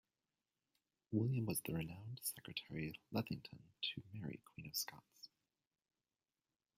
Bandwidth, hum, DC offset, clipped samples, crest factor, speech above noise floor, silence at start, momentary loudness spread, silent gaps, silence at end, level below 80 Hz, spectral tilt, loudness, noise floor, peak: 16 kHz; none; under 0.1%; under 0.1%; 22 dB; over 45 dB; 1.1 s; 17 LU; none; 1.5 s; -74 dBFS; -4.5 dB/octave; -45 LUFS; under -90 dBFS; -26 dBFS